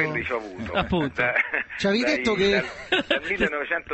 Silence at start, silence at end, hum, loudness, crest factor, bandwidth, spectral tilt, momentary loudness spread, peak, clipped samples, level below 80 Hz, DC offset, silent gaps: 0 s; 0 s; none; -24 LUFS; 18 dB; 8.4 kHz; -5 dB/octave; 6 LU; -6 dBFS; under 0.1%; -46 dBFS; under 0.1%; none